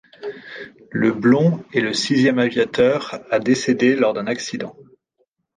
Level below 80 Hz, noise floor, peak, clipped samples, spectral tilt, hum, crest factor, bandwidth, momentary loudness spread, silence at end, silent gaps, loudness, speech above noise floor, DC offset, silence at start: -60 dBFS; -68 dBFS; -2 dBFS; under 0.1%; -5.5 dB/octave; none; 16 dB; 9.6 kHz; 17 LU; 0.75 s; none; -18 LUFS; 49 dB; under 0.1%; 0.2 s